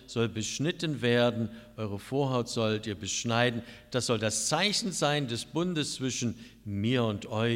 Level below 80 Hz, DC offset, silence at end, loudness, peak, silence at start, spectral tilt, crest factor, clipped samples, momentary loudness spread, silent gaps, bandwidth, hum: -62 dBFS; under 0.1%; 0 s; -30 LUFS; -12 dBFS; 0 s; -4 dB/octave; 18 dB; under 0.1%; 10 LU; none; 16 kHz; none